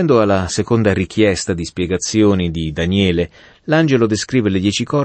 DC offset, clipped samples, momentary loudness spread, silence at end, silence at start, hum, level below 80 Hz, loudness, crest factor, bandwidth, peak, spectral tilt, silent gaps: under 0.1%; under 0.1%; 7 LU; 0 s; 0 s; none; -40 dBFS; -16 LUFS; 14 dB; 8.8 kHz; -2 dBFS; -5.5 dB/octave; none